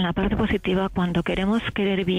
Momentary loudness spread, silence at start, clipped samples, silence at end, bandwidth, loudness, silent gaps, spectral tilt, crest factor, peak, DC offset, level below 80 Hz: 1 LU; 0 s; under 0.1%; 0 s; 10 kHz; -23 LUFS; none; -7.5 dB/octave; 12 dB; -12 dBFS; under 0.1%; -38 dBFS